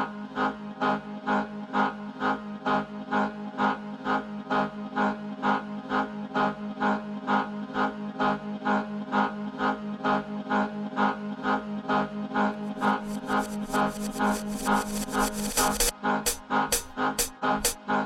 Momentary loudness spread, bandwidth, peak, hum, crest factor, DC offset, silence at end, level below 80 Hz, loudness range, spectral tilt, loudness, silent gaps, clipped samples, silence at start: 4 LU; 16 kHz; -10 dBFS; none; 18 dB; under 0.1%; 0 s; -48 dBFS; 3 LU; -3.5 dB/octave; -28 LUFS; none; under 0.1%; 0 s